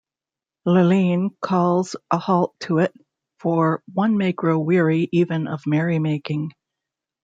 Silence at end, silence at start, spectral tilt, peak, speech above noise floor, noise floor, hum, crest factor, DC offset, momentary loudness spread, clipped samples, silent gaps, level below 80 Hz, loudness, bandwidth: 0.75 s; 0.65 s; -8 dB/octave; -4 dBFS; 70 dB; -90 dBFS; none; 18 dB; under 0.1%; 7 LU; under 0.1%; none; -66 dBFS; -21 LUFS; 7.8 kHz